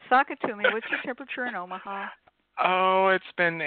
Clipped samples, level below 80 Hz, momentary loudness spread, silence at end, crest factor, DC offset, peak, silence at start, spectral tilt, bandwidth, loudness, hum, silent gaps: under 0.1%; -72 dBFS; 14 LU; 0 s; 18 dB; under 0.1%; -8 dBFS; 0.05 s; -8.5 dB/octave; 4.5 kHz; -26 LUFS; none; none